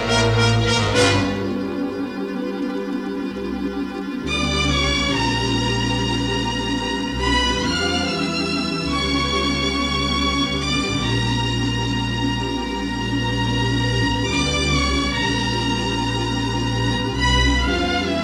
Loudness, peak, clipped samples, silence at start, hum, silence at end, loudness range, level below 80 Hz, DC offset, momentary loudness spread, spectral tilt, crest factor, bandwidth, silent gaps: -20 LUFS; -2 dBFS; under 0.1%; 0 s; none; 0 s; 2 LU; -30 dBFS; under 0.1%; 8 LU; -4.5 dB/octave; 18 dB; 12.5 kHz; none